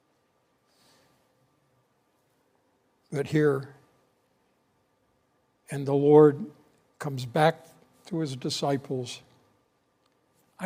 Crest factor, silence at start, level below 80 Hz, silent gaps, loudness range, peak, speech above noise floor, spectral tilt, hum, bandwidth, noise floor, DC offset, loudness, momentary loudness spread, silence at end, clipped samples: 24 dB; 3.1 s; -74 dBFS; none; 8 LU; -6 dBFS; 46 dB; -6.5 dB/octave; none; 15.5 kHz; -70 dBFS; under 0.1%; -26 LUFS; 21 LU; 0 s; under 0.1%